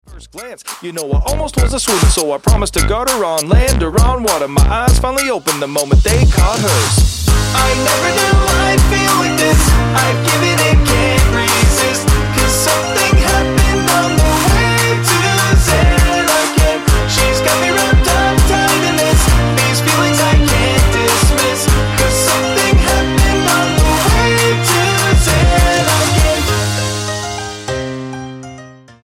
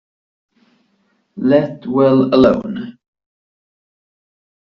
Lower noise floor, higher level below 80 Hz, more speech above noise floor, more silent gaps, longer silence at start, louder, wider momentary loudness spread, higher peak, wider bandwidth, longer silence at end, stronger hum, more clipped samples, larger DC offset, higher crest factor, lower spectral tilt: second, -36 dBFS vs -62 dBFS; first, -16 dBFS vs -52 dBFS; second, 24 dB vs 49 dB; neither; second, 0.1 s vs 1.35 s; about the same, -12 LUFS vs -14 LUFS; second, 6 LU vs 15 LU; about the same, 0 dBFS vs 0 dBFS; first, 16.5 kHz vs 6 kHz; second, 0.3 s vs 1.8 s; neither; neither; neither; second, 10 dB vs 18 dB; second, -4 dB/octave vs -6.5 dB/octave